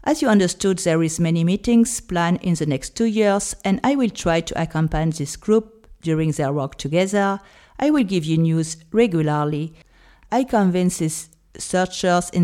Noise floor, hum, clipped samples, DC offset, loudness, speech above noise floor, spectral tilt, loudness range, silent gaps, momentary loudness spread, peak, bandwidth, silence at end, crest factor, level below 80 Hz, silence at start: -39 dBFS; none; under 0.1%; under 0.1%; -20 LUFS; 20 dB; -5.5 dB/octave; 2 LU; none; 7 LU; -4 dBFS; 15 kHz; 0 s; 16 dB; -44 dBFS; 0.05 s